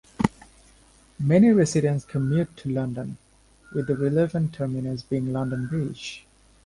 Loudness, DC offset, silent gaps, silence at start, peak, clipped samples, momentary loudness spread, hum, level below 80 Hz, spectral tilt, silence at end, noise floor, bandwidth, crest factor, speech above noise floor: -24 LUFS; under 0.1%; none; 0.2 s; -2 dBFS; under 0.1%; 16 LU; none; -54 dBFS; -7.5 dB/octave; 0.45 s; -55 dBFS; 11.5 kHz; 22 dB; 32 dB